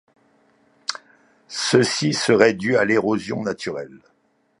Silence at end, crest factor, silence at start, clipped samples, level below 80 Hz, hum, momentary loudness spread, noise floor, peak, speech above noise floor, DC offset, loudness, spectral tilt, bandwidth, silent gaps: 0.65 s; 22 dB; 0.9 s; under 0.1%; -62 dBFS; none; 16 LU; -65 dBFS; 0 dBFS; 45 dB; under 0.1%; -20 LUFS; -4 dB/octave; 11.5 kHz; none